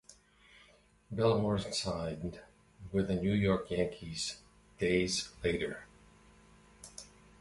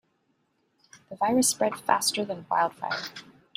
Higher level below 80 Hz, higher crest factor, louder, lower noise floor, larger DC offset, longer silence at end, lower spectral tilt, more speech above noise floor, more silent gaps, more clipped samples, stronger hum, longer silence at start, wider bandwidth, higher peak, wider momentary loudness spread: first, -54 dBFS vs -70 dBFS; about the same, 20 dB vs 22 dB; second, -34 LUFS vs -26 LUFS; second, -64 dBFS vs -72 dBFS; neither; about the same, 0.35 s vs 0.35 s; first, -5 dB/octave vs -2 dB/octave; second, 31 dB vs 45 dB; neither; neither; neither; second, 0.1 s vs 0.95 s; second, 11.5 kHz vs 16 kHz; second, -16 dBFS vs -6 dBFS; first, 20 LU vs 15 LU